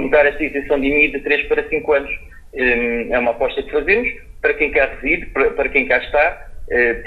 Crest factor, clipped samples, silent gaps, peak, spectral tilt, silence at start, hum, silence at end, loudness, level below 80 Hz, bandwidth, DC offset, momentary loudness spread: 16 dB; under 0.1%; none; 0 dBFS; -6.5 dB/octave; 0 s; none; 0 s; -17 LUFS; -36 dBFS; 5 kHz; under 0.1%; 7 LU